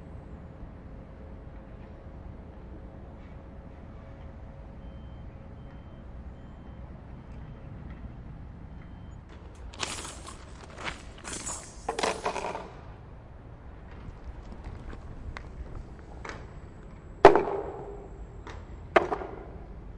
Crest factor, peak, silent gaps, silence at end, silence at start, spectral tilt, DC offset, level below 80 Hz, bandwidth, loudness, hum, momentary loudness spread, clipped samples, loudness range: 32 dB; -2 dBFS; none; 0 s; 0 s; -4.5 dB/octave; under 0.1%; -46 dBFS; 11.5 kHz; -30 LUFS; none; 17 LU; under 0.1%; 19 LU